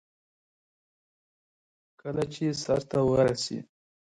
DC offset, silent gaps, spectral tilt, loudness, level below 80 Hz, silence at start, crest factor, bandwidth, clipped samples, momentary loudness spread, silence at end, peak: under 0.1%; none; -5.5 dB/octave; -28 LUFS; -58 dBFS; 2.05 s; 20 dB; 11 kHz; under 0.1%; 12 LU; 0.5 s; -12 dBFS